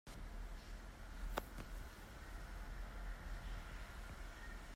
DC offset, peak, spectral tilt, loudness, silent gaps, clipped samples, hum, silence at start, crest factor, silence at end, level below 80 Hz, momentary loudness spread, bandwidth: under 0.1%; -26 dBFS; -4.5 dB/octave; -53 LUFS; none; under 0.1%; none; 0.05 s; 24 dB; 0 s; -50 dBFS; 7 LU; 16 kHz